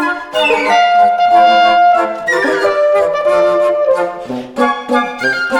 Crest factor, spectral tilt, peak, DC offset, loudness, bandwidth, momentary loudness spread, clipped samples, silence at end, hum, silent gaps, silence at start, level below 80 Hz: 10 dB; -3.5 dB/octave; 0 dBFS; under 0.1%; -12 LUFS; 12 kHz; 7 LU; under 0.1%; 0 s; none; none; 0 s; -52 dBFS